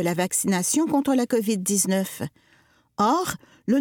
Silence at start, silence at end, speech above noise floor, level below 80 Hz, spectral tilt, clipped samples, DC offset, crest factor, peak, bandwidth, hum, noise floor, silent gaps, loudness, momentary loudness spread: 0 s; 0 s; 37 dB; -62 dBFS; -4 dB/octave; under 0.1%; under 0.1%; 16 dB; -8 dBFS; 19 kHz; none; -60 dBFS; none; -23 LUFS; 12 LU